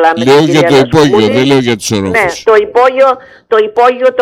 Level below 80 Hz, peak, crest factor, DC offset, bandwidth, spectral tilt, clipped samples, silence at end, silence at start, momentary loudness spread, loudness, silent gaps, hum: -42 dBFS; 0 dBFS; 8 dB; under 0.1%; 15.5 kHz; -5 dB/octave; 0.2%; 0 s; 0 s; 5 LU; -8 LUFS; none; none